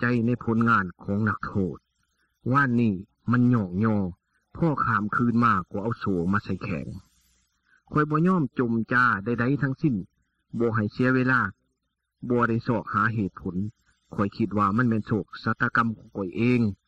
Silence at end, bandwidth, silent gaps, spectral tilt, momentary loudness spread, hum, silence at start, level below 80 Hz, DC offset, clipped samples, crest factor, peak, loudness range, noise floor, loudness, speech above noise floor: 0.15 s; 7.6 kHz; none; -9 dB/octave; 11 LU; none; 0 s; -56 dBFS; under 0.1%; under 0.1%; 16 dB; -8 dBFS; 2 LU; -79 dBFS; -25 LUFS; 54 dB